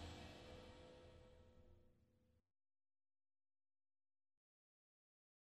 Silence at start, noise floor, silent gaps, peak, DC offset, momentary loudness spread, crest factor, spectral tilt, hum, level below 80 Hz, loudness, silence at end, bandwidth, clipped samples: 0 s; under -90 dBFS; none; -42 dBFS; under 0.1%; 10 LU; 24 dB; -5 dB/octave; none; -72 dBFS; -61 LUFS; 3 s; 13 kHz; under 0.1%